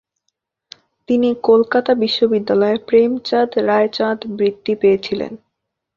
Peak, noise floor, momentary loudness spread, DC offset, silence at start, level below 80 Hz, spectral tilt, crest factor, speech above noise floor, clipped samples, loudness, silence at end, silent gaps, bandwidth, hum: -2 dBFS; -76 dBFS; 6 LU; under 0.1%; 1.1 s; -58 dBFS; -6.5 dB/octave; 16 dB; 60 dB; under 0.1%; -16 LUFS; 0.6 s; none; 7.2 kHz; none